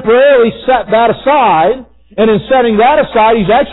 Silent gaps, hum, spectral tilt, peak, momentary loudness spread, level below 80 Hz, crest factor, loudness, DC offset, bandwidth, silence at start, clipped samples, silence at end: none; none; -11.5 dB/octave; 0 dBFS; 6 LU; -38 dBFS; 8 dB; -9 LUFS; under 0.1%; 4.1 kHz; 0 s; under 0.1%; 0 s